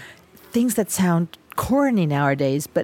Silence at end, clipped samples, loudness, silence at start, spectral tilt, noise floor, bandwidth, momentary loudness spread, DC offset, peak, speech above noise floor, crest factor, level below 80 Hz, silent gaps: 0 s; under 0.1%; -21 LUFS; 0 s; -6 dB/octave; -46 dBFS; 17 kHz; 7 LU; under 0.1%; -6 dBFS; 26 dB; 16 dB; -50 dBFS; none